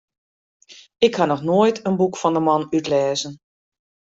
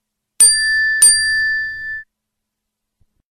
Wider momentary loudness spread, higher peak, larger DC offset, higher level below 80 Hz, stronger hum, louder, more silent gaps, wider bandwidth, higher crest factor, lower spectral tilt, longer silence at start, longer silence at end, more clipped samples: second, 4 LU vs 17 LU; second, -4 dBFS vs 0 dBFS; neither; second, -62 dBFS vs -48 dBFS; neither; second, -19 LUFS vs -11 LUFS; neither; second, 8 kHz vs 16 kHz; about the same, 18 dB vs 16 dB; first, -5.5 dB/octave vs 4 dB/octave; first, 0.7 s vs 0.4 s; second, 0.75 s vs 1.3 s; neither